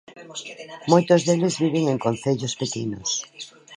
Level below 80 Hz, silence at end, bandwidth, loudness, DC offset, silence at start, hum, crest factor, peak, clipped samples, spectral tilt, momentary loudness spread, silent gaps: -62 dBFS; 0 s; 11 kHz; -22 LUFS; under 0.1%; 0.1 s; none; 22 dB; -2 dBFS; under 0.1%; -5 dB/octave; 18 LU; none